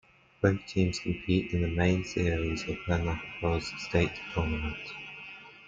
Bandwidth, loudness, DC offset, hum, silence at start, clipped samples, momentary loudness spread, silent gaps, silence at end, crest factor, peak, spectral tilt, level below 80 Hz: 7.8 kHz; -30 LUFS; under 0.1%; none; 0.4 s; under 0.1%; 11 LU; none; 0 s; 20 dB; -10 dBFS; -6.5 dB/octave; -46 dBFS